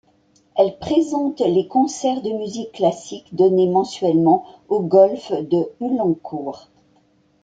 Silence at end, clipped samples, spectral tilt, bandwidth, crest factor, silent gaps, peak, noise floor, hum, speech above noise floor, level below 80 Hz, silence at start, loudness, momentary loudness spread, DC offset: 0.85 s; under 0.1%; -7 dB/octave; 9.2 kHz; 18 dB; none; -2 dBFS; -59 dBFS; none; 40 dB; -60 dBFS; 0.55 s; -19 LUFS; 13 LU; under 0.1%